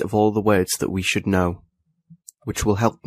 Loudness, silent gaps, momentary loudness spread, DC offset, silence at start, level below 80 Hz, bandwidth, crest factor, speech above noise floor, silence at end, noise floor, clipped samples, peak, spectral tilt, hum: -21 LUFS; none; 11 LU; under 0.1%; 0 s; -44 dBFS; 15.5 kHz; 18 dB; 33 dB; 0.15 s; -53 dBFS; under 0.1%; -4 dBFS; -5 dB/octave; none